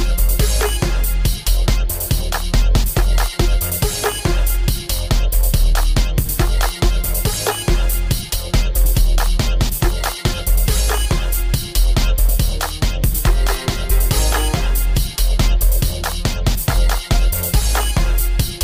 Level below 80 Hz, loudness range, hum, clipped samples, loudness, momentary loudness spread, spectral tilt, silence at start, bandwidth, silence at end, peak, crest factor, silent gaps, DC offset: -16 dBFS; 0 LU; none; under 0.1%; -18 LUFS; 3 LU; -4 dB/octave; 0 s; 16.5 kHz; 0 s; -2 dBFS; 12 dB; none; under 0.1%